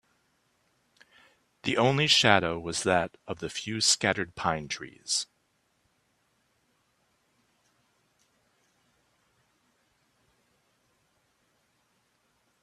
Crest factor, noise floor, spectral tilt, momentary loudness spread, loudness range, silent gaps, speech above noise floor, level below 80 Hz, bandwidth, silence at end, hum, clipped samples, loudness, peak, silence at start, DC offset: 30 dB; -73 dBFS; -2.5 dB/octave; 15 LU; 13 LU; none; 46 dB; -66 dBFS; 14 kHz; 7.4 s; none; under 0.1%; -26 LUFS; -2 dBFS; 1.65 s; under 0.1%